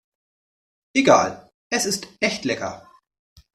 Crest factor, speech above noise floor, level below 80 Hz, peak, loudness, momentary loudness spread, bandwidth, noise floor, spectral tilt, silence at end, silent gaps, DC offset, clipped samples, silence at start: 22 dB; over 70 dB; -62 dBFS; -2 dBFS; -21 LUFS; 16 LU; 14.5 kHz; under -90 dBFS; -3 dB/octave; 0.75 s; 1.54-1.70 s; under 0.1%; under 0.1%; 0.95 s